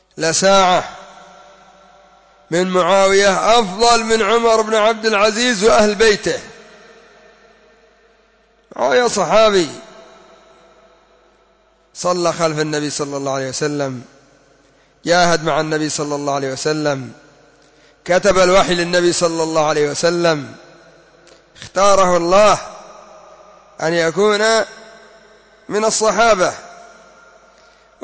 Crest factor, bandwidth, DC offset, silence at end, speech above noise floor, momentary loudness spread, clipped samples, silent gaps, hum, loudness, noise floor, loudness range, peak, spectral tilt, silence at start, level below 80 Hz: 14 dB; 8 kHz; under 0.1%; 1.2 s; 40 dB; 12 LU; under 0.1%; none; none; -15 LUFS; -55 dBFS; 7 LU; -2 dBFS; -3.5 dB/octave; 0.15 s; -46 dBFS